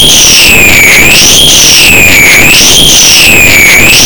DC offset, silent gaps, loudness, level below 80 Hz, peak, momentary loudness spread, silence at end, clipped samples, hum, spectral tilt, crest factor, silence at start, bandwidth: 20%; none; 1 LUFS; -20 dBFS; 0 dBFS; 0 LU; 0 s; 30%; none; -0.5 dB/octave; 2 dB; 0 s; over 20 kHz